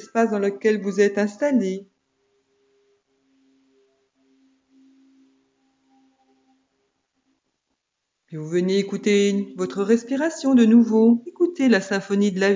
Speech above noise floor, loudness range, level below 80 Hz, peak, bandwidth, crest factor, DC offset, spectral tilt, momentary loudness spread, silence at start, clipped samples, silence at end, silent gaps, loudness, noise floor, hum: 59 dB; 12 LU; -80 dBFS; -6 dBFS; 7.6 kHz; 18 dB; under 0.1%; -6 dB/octave; 11 LU; 0 s; under 0.1%; 0 s; none; -20 LUFS; -79 dBFS; none